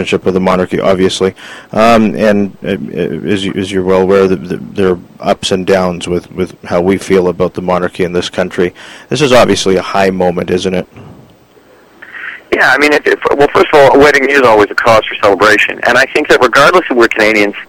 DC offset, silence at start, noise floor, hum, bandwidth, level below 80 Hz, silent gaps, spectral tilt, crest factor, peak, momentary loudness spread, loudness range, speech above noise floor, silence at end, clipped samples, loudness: under 0.1%; 0 s; -43 dBFS; none; 17 kHz; -40 dBFS; none; -5 dB/octave; 10 dB; 0 dBFS; 11 LU; 6 LU; 33 dB; 0.05 s; 0.6%; -10 LUFS